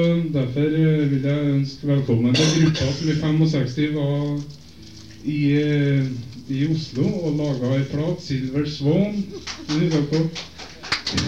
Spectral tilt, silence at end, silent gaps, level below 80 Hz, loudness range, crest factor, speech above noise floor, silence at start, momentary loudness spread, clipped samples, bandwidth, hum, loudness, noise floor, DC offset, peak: -6.5 dB/octave; 0 s; none; -48 dBFS; 4 LU; 16 dB; 22 dB; 0 s; 11 LU; under 0.1%; 9 kHz; none; -21 LUFS; -42 dBFS; 0.4%; -6 dBFS